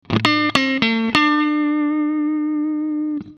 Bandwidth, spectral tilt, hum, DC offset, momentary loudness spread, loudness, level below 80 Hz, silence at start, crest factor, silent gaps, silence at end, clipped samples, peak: 11 kHz; -5 dB/octave; none; under 0.1%; 6 LU; -18 LUFS; -52 dBFS; 0.1 s; 18 dB; none; 0.05 s; under 0.1%; 0 dBFS